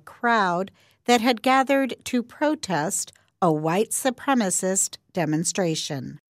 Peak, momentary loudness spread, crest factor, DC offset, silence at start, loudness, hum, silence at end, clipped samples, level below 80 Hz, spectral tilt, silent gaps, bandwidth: -8 dBFS; 9 LU; 16 dB; under 0.1%; 0.05 s; -23 LUFS; none; 0.15 s; under 0.1%; -70 dBFS; -3.5 dB/octave; none; 16 kHz